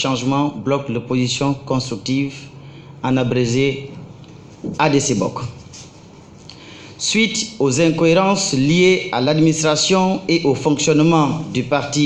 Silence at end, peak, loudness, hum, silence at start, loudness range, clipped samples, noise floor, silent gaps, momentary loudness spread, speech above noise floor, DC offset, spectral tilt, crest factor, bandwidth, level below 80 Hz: 0 s; -2 dBFS; -17 LUFS; none; 0 s; 7 LU; under 0.1%; -41 dBFS; none; 18 LU; 25 dB; under 0.1%; -4.5 dB/octave; 16 dB; 11 kHz; -48 dBFS